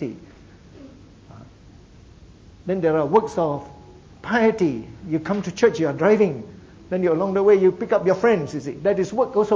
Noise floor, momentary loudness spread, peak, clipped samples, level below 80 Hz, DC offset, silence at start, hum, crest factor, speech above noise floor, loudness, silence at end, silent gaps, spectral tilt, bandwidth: -47 dBFS; 14 LU; -4 dBFS; under 0.1%; -52 dBFS; under 0.1%; 0 s; none; 18 dB; 27 dB; -21 LUFS; 0 s; none; -7 dB/octave; 7.8 kHz